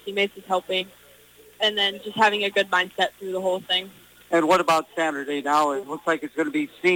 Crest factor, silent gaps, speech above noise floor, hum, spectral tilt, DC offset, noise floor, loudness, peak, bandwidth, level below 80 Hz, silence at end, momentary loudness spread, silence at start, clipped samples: 18 dB; none; 28 dB; none; -3 dB/octave; under 0.1%; -52 dBFS; -23 LUFS; -6 dBFS; over 20 kHz; -68 dBFS; 0 s; 8 LU; 0.05 s; under 0.1%